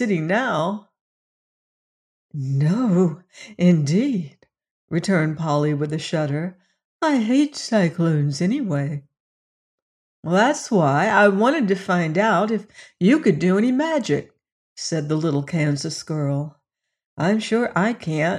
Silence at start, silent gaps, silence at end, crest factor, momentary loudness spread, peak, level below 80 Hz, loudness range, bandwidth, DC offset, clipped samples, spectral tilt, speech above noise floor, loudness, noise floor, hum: 0 s; 1.01-2.29 s, 4.71-4.88 s, 6.85-6.99 s, 9.20-10.23 s, 14.52-14.76 s, 17.06-17.17 s; 0 s; 18 dB; 10 LU; -4 dBFS; -66 dBFS; 5 LU; 11 kHz; under 0.1%; under 0.1%; -6.5 dB/octave; over 70 dB; -21 LUFS; under -90 dBFS; none